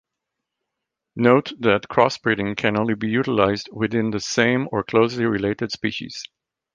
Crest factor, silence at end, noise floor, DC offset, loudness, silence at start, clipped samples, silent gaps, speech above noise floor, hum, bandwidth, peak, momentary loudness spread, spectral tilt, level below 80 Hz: 20 dB; 0.5 s; -82 dBFS; under 0.1%; -21 LUFS; 1.15 s; under 0.1%; none; 62 dB; none; 9.4 kHz; -2 dBFS; 8 LU; -5.5 dB/octave; -54 dBFS